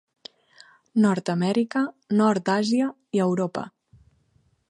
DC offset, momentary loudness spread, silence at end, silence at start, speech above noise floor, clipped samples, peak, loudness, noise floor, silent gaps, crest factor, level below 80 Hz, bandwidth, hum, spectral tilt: under 0.1%; 7 LU; 1 s; 0.95 s; 43 dB; under 0.1%; -8 dBFS; -24 LUFS; -65 dBFS; none; 16 dB; -68 dBFS; 10.5 kHz; none; -6.5 dB/octave